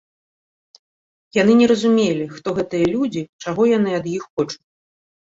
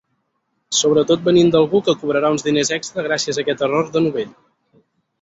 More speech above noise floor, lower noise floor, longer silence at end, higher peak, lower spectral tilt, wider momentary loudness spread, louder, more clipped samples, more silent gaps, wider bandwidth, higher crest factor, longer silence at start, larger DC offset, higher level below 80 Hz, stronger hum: first, over 72 dB vs 53 dB; first, under -90 dBFS vs -70 dBFS; about the same, 0.85 s vs 0.9 s; about the same, -2 dBFS vs -2 dBFS; first, -6 dB/octave vs -4 dB/octave; first, 12 LU vs 8 LU; about the same, -19 LUFS vs -17 LUFS; neither; first, 3.29-3.39 s, 4.30-4.37 s vs none; about the same, 7.8 kHz vs 8 kHz; about the same, 16 dB vs 16 dB; first, 1.35 s vs 0.7 s; neither; about the same, -56 dBFS vs -56 dBFS; neither